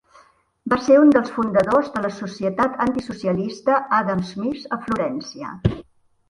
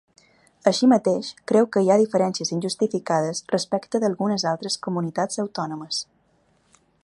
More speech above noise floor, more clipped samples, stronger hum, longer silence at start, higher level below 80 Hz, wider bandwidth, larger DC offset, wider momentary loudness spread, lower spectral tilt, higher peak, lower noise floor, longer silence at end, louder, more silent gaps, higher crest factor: second, 35 dB vs 41 dB; neither; neither; about the same, 0.65 s vs 0.65 s; first, -46 dBFS vs -70 dBFS; about the same, 11 kHz vs 11.5 kHz; neither; first, 12 LU vs 9 LU; first, -7 dB/octave vs -5 dB/octave; about the same, -2 dBFS vs -2 dBFS; second, -55 dBFS vs -63 dBFS; second, 0.5 s vs 1 s; first, -20 LUFS vs -23 LUFS; neither; about the same, 18 dB vs 20 dB